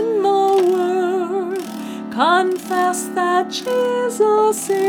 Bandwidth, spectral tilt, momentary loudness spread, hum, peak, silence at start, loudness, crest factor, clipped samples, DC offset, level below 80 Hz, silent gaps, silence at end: 19.5 kHz; -3.5 dB/octave; 9 LU; none; -2 dBFS; 0 s; -18 LUFS; 14 dB; under 0.1%; under 0.1%; -70 dBFS; none; 0 s